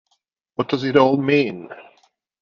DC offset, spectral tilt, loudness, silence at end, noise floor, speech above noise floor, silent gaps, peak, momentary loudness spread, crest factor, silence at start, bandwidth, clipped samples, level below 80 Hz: under 0.1%; -7 dB/octave; -19 LUFS; 0.6 s; -70 dBFS; 51 dB; none; 0 dBFS; 19 LU; 20 dB; 0.6 s; 7 kHz; under 0.1%; -62 dBFS